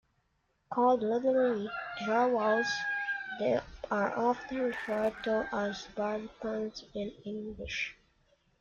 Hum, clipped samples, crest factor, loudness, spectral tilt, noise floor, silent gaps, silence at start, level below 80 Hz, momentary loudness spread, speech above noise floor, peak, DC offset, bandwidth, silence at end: none; under 0.1%; 16 dB; -32 LUFS; -5 dB/octave; -76 dBFS; none; 0.7 s; -62 dBFS; 11 LU; 44 dB; -16 dBFS; under 0.1%; 7.4 kHz; 0.7 s